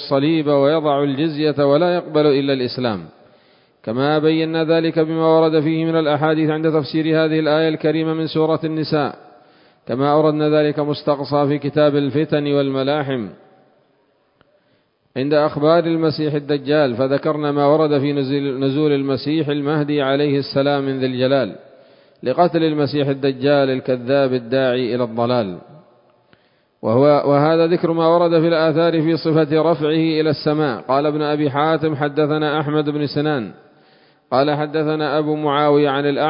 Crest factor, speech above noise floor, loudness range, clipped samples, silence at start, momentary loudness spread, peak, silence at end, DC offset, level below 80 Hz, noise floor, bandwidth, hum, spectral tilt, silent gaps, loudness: 18 dB; 44 dB; 4 LU; under 0.1%; 0 s; 6 LU; 0 dBFS; 0 s; under 0.1%; -62 dBFS; -61 dBFS; 5.4 kHz; none; -12 dB/octave; none; -17 LUFS